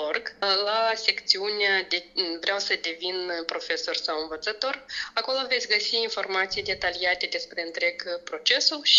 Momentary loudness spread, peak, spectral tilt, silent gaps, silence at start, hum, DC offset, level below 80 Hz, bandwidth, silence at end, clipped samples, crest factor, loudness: 8 LU; -4 dBFS; -0.5 dB/octave; none; 0 s; none; under 0.1%; -62 dBFS; 7.8 kHz; 0 s; under 0.1%; 22 dB; -25 LUFS